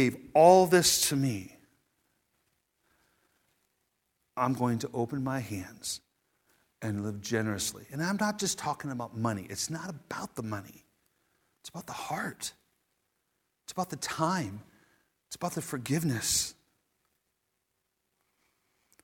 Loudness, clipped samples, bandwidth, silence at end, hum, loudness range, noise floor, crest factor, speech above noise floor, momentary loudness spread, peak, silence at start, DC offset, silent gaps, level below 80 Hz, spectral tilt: -30 LUFS; under 0.1%; 18 kHz; 2.5 s; none; 8 LU; -81 dBFS; 24 dB; 51 dB; 18 LU; -8 dBFS; 0 s; under 0.1%; none; -66 dBFS; -4 dB/octave